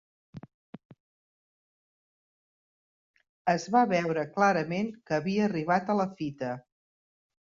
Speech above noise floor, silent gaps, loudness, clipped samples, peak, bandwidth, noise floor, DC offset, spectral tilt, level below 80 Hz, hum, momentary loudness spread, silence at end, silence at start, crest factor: over 62 dB; 0.54-0.73 s, 0.85-0.90 s, 1.00-3.14 s, 3.29-3.45 s; -28 LUFS; under 0.1%; -12 dBFS; 7.6 kHz; under -90 dBFS; under 0.1%; -6.5 dB/octave; -70 dBFS; none; 10 LU; 1 s; 0.35 s; 20 dB